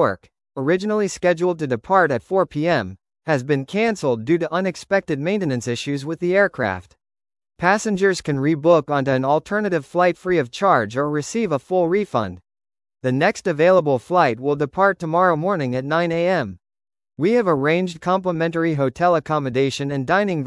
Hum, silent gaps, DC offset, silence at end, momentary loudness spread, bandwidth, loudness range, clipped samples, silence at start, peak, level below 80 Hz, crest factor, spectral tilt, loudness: none; none; under 0.1%; 0 s; 6 LU; 12 kHz; 3 LU; under 0.1%; 0 s; -2 dBFS; -58 dBFS; 18 dB; -6 dB/octave; -20 LUFS